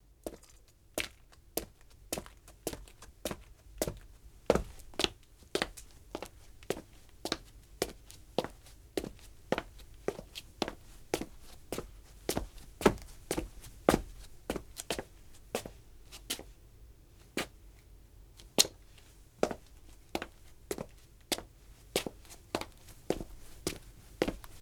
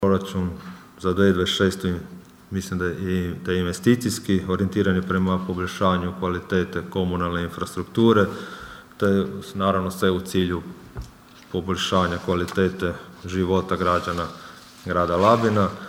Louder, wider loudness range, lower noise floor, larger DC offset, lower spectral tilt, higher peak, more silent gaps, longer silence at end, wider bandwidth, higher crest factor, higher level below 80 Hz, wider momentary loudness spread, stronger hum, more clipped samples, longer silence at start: second, -38 LUFS vs -23 LUFS; first, 7 LU vs 2 LU; first, -60 dBFS vs -45 dBFS; neither; second, -3 dB/octave vs -6 dB/octave; about the same, -4 dBFS vs -4 dBFS; neither; about the same, 0 s vs 0 s; first, over 20 kHz vs 16 kHz; first, 34 dB vs 20 dB; about the same, -52 dBFS vs -48 dBFS; first, 24 LU vs 15 LU; neither; neither; first, 0.25 s vs 0 s